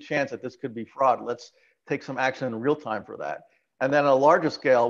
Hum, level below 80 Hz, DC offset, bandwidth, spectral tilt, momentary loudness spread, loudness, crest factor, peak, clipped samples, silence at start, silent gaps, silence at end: none; -74 dBFS; under 0.1%; 7.4 kHz; -6 dB/octave; 16 LU; -25 LUFS; 20 dB; -6 dBFS; under 0.1%; 0 s; none; 0 s